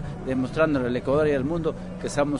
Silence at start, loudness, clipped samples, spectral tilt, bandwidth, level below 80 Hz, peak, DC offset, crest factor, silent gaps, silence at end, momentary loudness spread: 0 s; -25 LUFS; under 0.1%; -6.5 dB/octave; 11 kHz; -42 dBFS; -10 dBFS; under 0.1%; 14 dB; none; 0 s; 7 LU